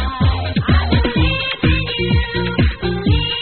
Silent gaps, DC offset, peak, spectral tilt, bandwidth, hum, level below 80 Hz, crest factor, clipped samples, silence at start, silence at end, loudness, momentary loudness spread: none; 0.4%; -4 dBFS; -4.5 dB/octave; 4.5 kHz; none; -22 dBFS; 12 dB; under 0.1%; 0 s; 0 s; -17 LUFS; 3 LU